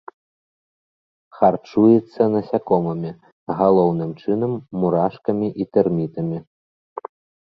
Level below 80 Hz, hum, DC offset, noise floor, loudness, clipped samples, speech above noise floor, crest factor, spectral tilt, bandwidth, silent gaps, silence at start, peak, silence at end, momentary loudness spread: -58 dBFS; none; under 0.1%; under -90 dBFS; -20 LUFS; under 0.1%; over 71 dB; 20 dB; -11 dB/octave; 6 kHz; 3.32-3.47 s; 1.35 s; -2 dBFS; 1.05 s; 17 LU